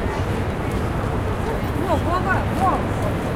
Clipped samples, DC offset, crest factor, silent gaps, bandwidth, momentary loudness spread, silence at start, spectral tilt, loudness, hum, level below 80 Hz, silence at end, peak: under 0.1%; under 0.1%; 16 dB; none; 16 kHz; 4 LU; 0 s; -7 dB/octave; -22 LUFS; none; -30 dBFS; 0 s; -6 dBFS